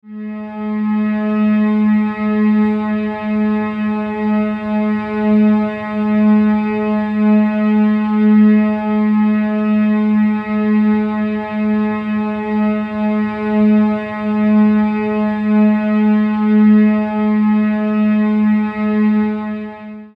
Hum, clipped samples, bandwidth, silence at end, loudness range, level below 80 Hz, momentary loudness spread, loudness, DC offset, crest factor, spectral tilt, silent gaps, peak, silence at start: none; under 0.1%; 4.7 kHz; 0.1 s; 3 LU; -50 dBFS; 7 LU; -15 LUFS; under 0.1%; 10 dB; -10 dB/octave; none; -4 dBFS; 0.05 s